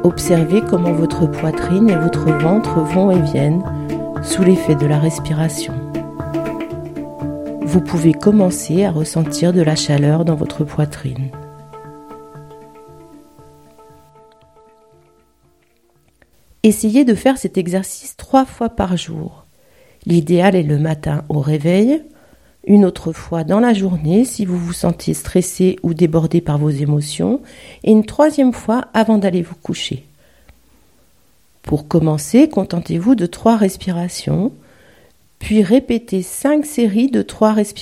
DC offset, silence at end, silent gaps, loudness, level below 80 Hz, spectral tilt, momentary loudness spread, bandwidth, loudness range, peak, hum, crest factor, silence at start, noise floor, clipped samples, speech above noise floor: 0.2%; 0 s; none; -16 LUFS; -42 dBFS; -6.5 dB/octave; 12 LU; 15 kHz; 5 LU; 0 dBFS; none; 16 dB; 0 s; -57 dBFS; under 0.1%; 43 dB